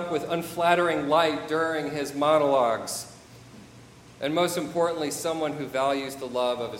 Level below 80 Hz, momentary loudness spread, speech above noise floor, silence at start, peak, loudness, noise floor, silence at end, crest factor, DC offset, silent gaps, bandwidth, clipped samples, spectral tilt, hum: -64 dBFS; 8 LU; 24 dB; 0 s; -6 dBFS; -26 LUFS; -49 dBFS; 0 s; 20 dB; under 0.1%; none; 16 kHz; under 0.1%; -4 dB/octave; none